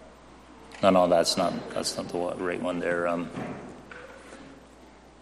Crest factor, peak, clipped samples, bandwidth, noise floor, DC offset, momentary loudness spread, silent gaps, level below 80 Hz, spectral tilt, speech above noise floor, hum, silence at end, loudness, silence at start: 22 dB; -8 dBFS; under 0.1%; 13.5 kHz; -51 dBFS; under 0.1%; 24 LU; none; -58 dBFS; -4 dB/octave; 25 dB; none; 0.25 s; -27 LUFS; 0 s